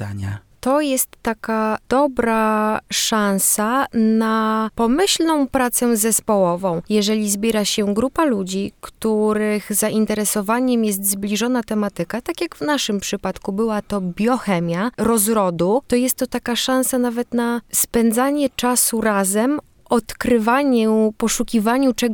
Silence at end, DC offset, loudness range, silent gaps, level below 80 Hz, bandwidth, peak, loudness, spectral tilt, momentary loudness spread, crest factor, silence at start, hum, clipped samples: 0 s; under 0.1%; 3 LU; none; -48 dBFS; over 20 kHz; -4 dBFS; -19 LUFS; -3.5 dB/octave; 7 LU; 16 dB; 0 s; none; under 0.1%